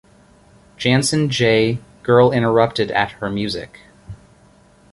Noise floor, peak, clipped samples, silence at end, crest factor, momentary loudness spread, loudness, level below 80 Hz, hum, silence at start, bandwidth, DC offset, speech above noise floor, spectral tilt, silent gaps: -51 dBFS; -2 dBFS; under 0.1%; 0.8 s; 18 dB; 11 LU; -17 LUFS; -48 dBFS; none; 0.8 s; 11.5 kHz; under 0.1%; 34 dB; -5 dB/octave; none